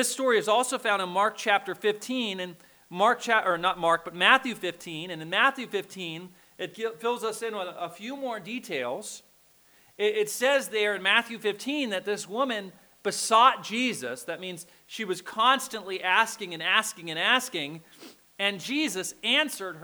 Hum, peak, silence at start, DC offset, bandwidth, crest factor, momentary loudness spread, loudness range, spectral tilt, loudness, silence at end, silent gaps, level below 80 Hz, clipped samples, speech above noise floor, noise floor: none; -4 dBFS; 0 s; under 0.1%; over 20 kHz; 24 dB; 14 LU; 8 LU; -2 dB/octave; -26 LUFS; 0 s; none; -74 dBFS; under 0.1%; 33 dB; -61 dBFS